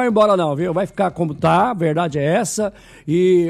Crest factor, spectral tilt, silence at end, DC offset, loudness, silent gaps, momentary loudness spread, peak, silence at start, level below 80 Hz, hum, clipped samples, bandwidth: 14 dB; -6 dB/octave; 0 s; under 0.1%; -18 LUFS; none; 7 LU; -4 dBFS; 0 s; -52 dBFS; none; under 0.1%; 13 kHz